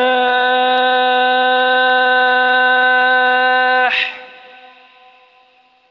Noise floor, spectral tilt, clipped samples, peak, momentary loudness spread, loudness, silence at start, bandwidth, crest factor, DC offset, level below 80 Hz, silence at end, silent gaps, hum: -52 dBFS; -3 dB/octave; under 0.1%; -4 dBFS; 2 LU; -12 LUFS; 0 s; 6 kHz; 10 dB; under 0.1%; -62 dBFS; 1.6 s; none; none